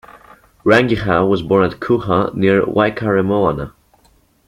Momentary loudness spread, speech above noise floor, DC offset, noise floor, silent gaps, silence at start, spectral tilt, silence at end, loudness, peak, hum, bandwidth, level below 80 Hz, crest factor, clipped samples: 6 LU; 40 dB; under 0.1%; -54 dBFS; none; 0.65 s; -7.5 dB/octave; 0.8 s; -15 LUFS; 0 dBFS; none; 12 kHz; -44 dBFS; 16 dB; under 0.1%